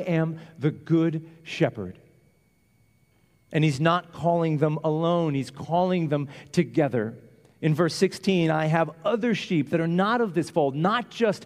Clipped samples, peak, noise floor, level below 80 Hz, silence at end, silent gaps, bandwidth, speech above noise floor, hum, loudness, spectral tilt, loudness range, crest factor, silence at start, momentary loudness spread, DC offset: under 0.1%; -6 dBFS; -64 dBFS; -66 dBFS; 0 s; none; 12 kHz; 40 dB; none; -25 LUFS; -7 dB/octave; 5 LU; 18 dB; 0 s; 7 LU; under 0.1%